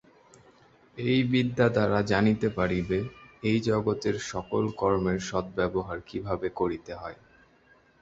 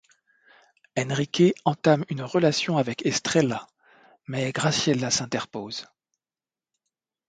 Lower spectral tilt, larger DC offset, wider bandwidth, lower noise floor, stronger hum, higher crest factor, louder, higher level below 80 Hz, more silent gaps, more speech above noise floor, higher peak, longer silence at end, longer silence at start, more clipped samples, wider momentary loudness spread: first, -6.5 dB/octave vs -4.5 dB/octave; neither; second, 8 kHz vs 9.4 kHz; second, -61 dBFS vs under -90 dBFS; neither; about the same, 20 dB vs 22 dB; second, -28 LUFS vs -25 LUFS; first, -52 dBFS vs -64 dBFS; neither; second, 34 dB vs over 66 dB; about the same, -8 dBFS vs -6 dBFS; second, 0.9 s vs 1.45 s; about the same, 0.95 s vs 0.95 s; neither; about the same, 12 LU vs 12 LU